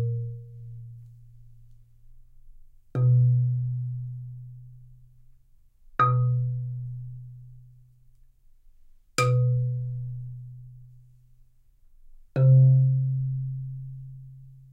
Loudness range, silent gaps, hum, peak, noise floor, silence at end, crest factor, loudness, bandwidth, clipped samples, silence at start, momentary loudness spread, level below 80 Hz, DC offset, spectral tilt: 6 LU; none; none; -8 dBFS; -57 dBFS; 0.2 s; 18 dB; -25 LUFS; 9.2 kHz; under 0.1%; 0 s; 25 LU; -54 dBFS; under 0.1%; -7.5 dB/octave